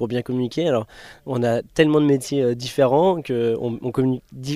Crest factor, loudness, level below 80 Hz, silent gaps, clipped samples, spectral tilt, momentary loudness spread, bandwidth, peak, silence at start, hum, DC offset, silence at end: 18 dB; -21 LUFS; -54 dBFS; none; under 0.1%; -6.5 dB/octave; 8 LU; 14.5 kHz; -4 dBFS; 0 s; none; under 0.1%; 0 s